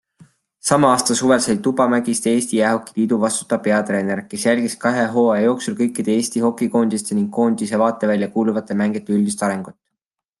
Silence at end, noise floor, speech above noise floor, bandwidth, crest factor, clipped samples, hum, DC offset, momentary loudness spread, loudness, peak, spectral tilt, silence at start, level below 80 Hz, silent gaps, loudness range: 0.7 s; -81 dBFS; 64 dB; 12.5 kHz; 16 dB; under 0.1%; none; under 0.1%; 5 LU; -18 LUFS; -2 dBFS; -4.5 dB/octave; 0.65 s; -64 dBFS; none; 2 LU